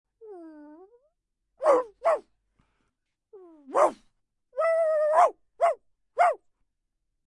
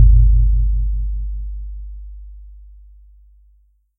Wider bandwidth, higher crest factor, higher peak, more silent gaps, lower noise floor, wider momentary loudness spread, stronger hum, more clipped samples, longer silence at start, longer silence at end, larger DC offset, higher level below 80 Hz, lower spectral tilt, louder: first, 11.5 kHz vs 0.2 kHz; about the same, 20 dB vs 16 dB; second, -8 dBFS vs 0 dBFS; neither; first, -79 dBFS vs -55 dBFS; second, 16 LU vs 25 LU; neither; neither; first, 0.25 s vs 0 s; second, 0.9 s vs 1.45 s; neither; second, -76 dBFS vs -18 dBFS; second, -3 dB/octave vs -13.5 dB/octave; second, -25 LUFS vs -19 LUFS